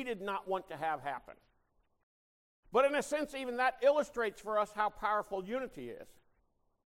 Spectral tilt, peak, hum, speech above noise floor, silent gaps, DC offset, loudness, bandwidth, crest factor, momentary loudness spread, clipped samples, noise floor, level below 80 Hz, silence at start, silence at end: -4 dB/octave; -18 dBFS; none; 41 dB; 2.03-2.63 s; under 0.1%; -34 LUFS; 16 kHz; 18 dB; 13 LU; under 0.1%; -76 dBFS; -66 dBFS; 0 s; 0.75 s